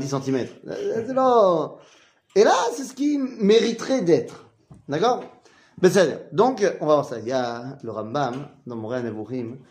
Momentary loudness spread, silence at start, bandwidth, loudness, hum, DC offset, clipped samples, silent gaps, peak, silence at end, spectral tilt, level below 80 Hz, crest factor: 14 LU; 0 s; 15.5 kHz; -22 LUFS; none; under 0.1%; under 0.1%; none; -4 dBFS; 0.15 s; -5.5 dB/octave; -68 dBFS; 18 dB